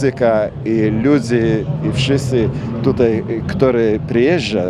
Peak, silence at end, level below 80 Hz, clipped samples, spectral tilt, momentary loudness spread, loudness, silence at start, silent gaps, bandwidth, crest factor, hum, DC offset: 0 dBFS; 0 s; -38 dBFS; under 0.1%; -7 dB/octave; 5 LU; -16 LUFS; 0 s; none; 11.5 kHz; 16 dB; none; under 0.1%